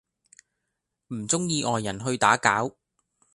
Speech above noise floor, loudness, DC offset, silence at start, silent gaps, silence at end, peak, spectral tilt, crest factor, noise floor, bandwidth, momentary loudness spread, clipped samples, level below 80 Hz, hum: 57 dB; -24 LUFS; under 0.1%; 1.1 s; none; 0.65 s; -4 dBFS; -3.5 dB/octave; 24 dB; -82 dBFS; 11.5 kHz; 14 LU; under 0.1%; -62 dBFS; none